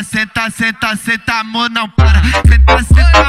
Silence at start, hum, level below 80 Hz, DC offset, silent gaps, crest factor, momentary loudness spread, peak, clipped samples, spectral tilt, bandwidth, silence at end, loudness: 0 s; none; -12 dBFS; under 0.1%; none; 10 dB; 7 LU; 0 dBFS; 0.2%; -5 dB/octave; 12.5 kHz; 0 s; -11 LUFS